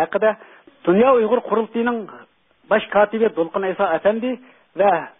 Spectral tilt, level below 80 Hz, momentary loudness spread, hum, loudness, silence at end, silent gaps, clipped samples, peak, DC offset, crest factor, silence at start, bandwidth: -11 dB/octave; -60 dBFS; 13 LU; none; -19 LUFS; 0.1 s; none; under 0.1%; -4 dBFS; under 0.1%; 16 dB; 0 s; 3.9 kHz